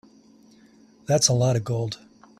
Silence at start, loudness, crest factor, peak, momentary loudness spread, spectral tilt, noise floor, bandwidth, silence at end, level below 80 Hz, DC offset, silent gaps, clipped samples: 1.1 s; -22 LUFS; 22 dB; -4 dBFS; 19 LU; -4.5 dB/octave; -54 dBFS; 13.5 kHz; 0.45 s; -58 dBFS; under 0.1%; none; under 0.1%